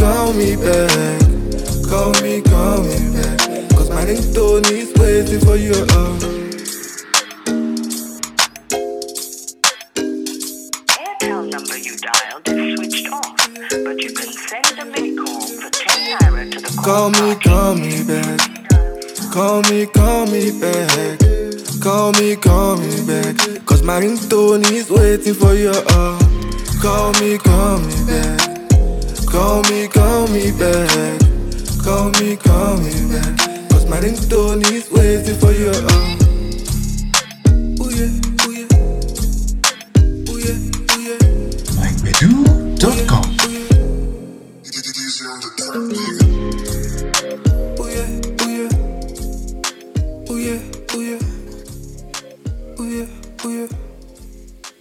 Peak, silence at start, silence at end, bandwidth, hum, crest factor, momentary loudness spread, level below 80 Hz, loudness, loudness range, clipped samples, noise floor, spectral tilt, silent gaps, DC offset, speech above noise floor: 0 dBFS; 0 s; 0.1 s; 18 kHz; none; 14 dB; 11 LU; -20 dBFS; -15 LUFS; 7 LU; under 0.1%; -37 dBFS; -4.5 dB/octave; none; under 0.1%; 24 dB